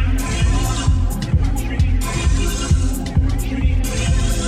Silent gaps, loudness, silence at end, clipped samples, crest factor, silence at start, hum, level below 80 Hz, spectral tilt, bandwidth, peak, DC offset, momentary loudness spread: none; -19 LUFS; 0 s; under 0.1%; 12 dB; 0 s; none; -18 dBFS; -5 dB/octave; 15 kHz; -4 dBFS; under 0.1%; 2 LU